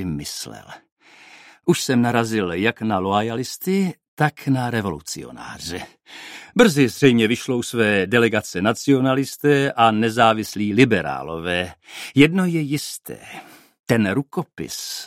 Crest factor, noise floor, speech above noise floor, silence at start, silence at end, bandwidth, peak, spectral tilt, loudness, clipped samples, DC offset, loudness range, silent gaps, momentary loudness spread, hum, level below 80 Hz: 20 dB; -47 dBFS; 27 dB; 0 s; 0 s; 16 kHz; 0 dBFS; -5 dB/octave; -20 LUFS; under 0.1%; under 0.1%; 5 LU; 0.92-0.97 s, 4.08-4.17 s, 13.80-13.84 s; 17 LU; none; -54 dBFS